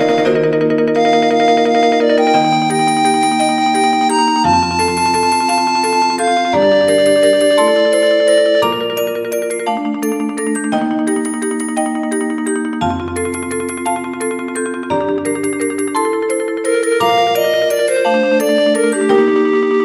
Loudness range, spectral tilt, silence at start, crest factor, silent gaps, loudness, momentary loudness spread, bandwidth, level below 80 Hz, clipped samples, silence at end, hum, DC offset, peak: 6 LU; -4 dB/octave; 0 s; 14 dB; none; -14 LUFS; 7 LU; 15.5 kHz; -50 dBFS; under 0.1%; 0 s; none; under 0.1%; 0 dBFS